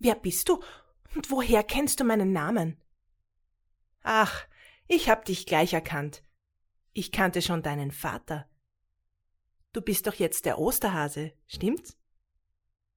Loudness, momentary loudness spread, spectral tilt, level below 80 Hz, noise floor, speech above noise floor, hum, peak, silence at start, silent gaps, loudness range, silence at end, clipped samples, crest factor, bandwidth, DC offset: -28 LUFS; 13 LU; -4 dB/octave; -48 dBFS; -78 dBFS; 50 dB; none; -6 dBFS; 0 s; none; 5 LU; 1.05 s; under 0.1%; 22 dB; over 20 kHz; under 0.1%